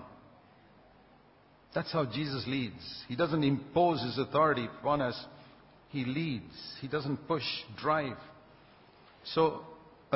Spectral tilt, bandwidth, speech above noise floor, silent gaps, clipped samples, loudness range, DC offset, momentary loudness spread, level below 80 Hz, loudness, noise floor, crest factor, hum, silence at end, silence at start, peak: -9.5 dB/octave; 5.8 kHz; 30 dB; none; under 0.1%; 5 LU; under 0.1%; 16 LU; -64 dBFS; -32 LUFS; -62 dBFS; 20 dB; none; 0 s; 0 s; -14 dBFS